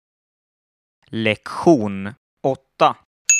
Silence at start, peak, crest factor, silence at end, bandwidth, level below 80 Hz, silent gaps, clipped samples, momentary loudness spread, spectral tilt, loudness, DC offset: 1.1 s; 0 dBFS; 20 dB; 0 s; 13.5 kHz; -62 dBFS; 2.17-2.37 s, 3.05-3.25 s; under 0.1%; 14 LU; -3.5 dB/octave; -20 LUFS; under 0.1%